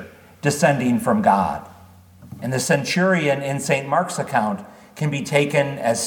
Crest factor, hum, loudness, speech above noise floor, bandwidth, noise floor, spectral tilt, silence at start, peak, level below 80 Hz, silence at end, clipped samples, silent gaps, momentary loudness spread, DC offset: 18 dB; none; -20 LUFS; 27 dB; 19 kHz; -46 dBFS; -5 dB/octave; 0 s; -2 dBFS; -58 dBFS; 0 s; under 0.1%; none; 9 LU; under 0.1%